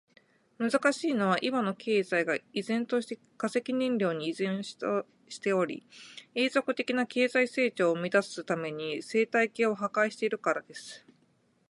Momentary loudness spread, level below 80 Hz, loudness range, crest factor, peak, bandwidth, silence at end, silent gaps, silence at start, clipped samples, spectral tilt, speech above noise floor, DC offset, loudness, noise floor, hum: 9 LU; -80 dBFS; 3 LU; 18 dB; -12 dBFS; 11.5 kHz; 0.7 s; none; 0.6 s; under 0.1%; -5 dB/octave; 39 dB; under 0.1%; -30 LUFS; -69 dBFS; none